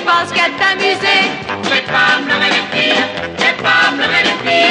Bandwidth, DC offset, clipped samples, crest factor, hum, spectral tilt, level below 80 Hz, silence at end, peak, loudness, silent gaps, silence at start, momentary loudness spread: 11 kHz; under 0.1%; under 0.1%; 12 dB; none; -3 dB/octave; -52 dBFS; 0 s; 0 dBFS; -12 LUFS; none; 0 s; 4 LU